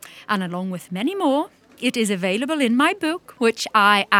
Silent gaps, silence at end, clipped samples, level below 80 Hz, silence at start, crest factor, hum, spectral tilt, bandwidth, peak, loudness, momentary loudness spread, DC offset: none; 0 s; under 0.1%; -72 dBFS; 0.05 s; 20 dB; none; -4 dB/octave; 17.5 kHz; 0 dBFS; -21 LUFS; 9 LU; under 0.1%